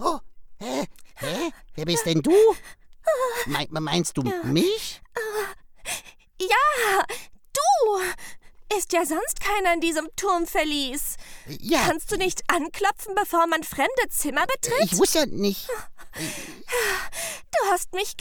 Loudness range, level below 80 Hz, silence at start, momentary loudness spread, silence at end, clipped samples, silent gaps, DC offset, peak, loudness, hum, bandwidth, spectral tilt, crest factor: 2 LU; -46 dBFS; 0 s; 13 LU; 0 s; under 0.1%; none; under 0.1%; -4 dBFS; -24 LUFS; none; 19 kHz; -3 dB/octave; 20 dB